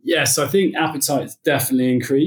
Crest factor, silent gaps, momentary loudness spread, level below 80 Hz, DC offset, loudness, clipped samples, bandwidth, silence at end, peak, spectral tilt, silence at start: 14 dB; none; 4 LU; -68 dBFS; under 0.1%; -18 LUFS; under 0.1%; 19.5 kHz; 0 s; -4 dBFS; -4 dB/octave; 0.05 s